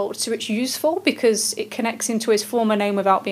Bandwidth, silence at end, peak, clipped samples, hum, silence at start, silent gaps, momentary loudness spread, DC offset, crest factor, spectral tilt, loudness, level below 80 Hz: 16 kHz; 0 s; -4 dBFS; under 0.1%; none; 0 s; none; 5 LU; under 0.1%; 18 dB; -3 dB/octave; -21 LUFS; -78 dBFS